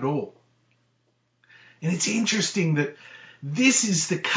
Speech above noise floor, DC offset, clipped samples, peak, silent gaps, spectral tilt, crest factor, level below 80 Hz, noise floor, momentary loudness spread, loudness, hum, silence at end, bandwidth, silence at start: 46 dB; under 0.1%; under 0.1%; -8 dBFS; none; -3.5 dB/octave; 18 dB; -76 dBFS; -70 dBFS; 20 LU; -23 LUFS; none; 0 s; 8 kHz; 0 s